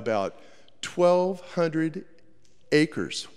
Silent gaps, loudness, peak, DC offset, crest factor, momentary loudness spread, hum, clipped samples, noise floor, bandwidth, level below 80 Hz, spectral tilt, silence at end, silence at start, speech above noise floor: none; -26 LUFS; -8 dBFS; 0.4%; 20 dB; 13 LU; none; under 0.1%; -62 dBFS; 11.5 kHz; -70 dBFS; -5.5 dB/octave; 0.1 s; 0 s; 37 dB